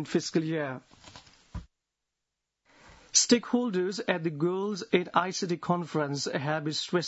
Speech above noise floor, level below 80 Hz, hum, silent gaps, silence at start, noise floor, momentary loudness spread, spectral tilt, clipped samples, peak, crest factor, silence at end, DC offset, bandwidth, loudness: 57 dB; -58 dBFS; none; none; 0 s; -86 dBFS; 13 LU; -3.5 dB/octave; under 0.1%; -8 dBFS; 22 dB; 0 s; under 0.1%; 8 kHz; -28 LUFS